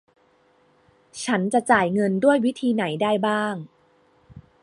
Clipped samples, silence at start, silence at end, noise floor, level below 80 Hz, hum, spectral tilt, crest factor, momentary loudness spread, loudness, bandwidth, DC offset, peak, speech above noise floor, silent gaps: under 0.1%; 1.15 s; 0.2 s; -61 dBFS; -64 dBFS; none; -5.5 dB/octave; 22 dB; 11 LU; -22 LUFS; 11.5 kHz; under 0.1%; -2 dBFS; 39 dB; none